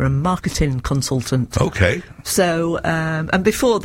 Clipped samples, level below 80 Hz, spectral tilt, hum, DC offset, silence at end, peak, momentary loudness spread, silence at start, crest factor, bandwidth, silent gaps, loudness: under 0.1%; -34 dBFS; -5 dB/octave; none; under 0.1%; 0 s; -2 dBFS; 4 LU; 0 s; 16 dB; 16.5 kHz; none; -19 LUFS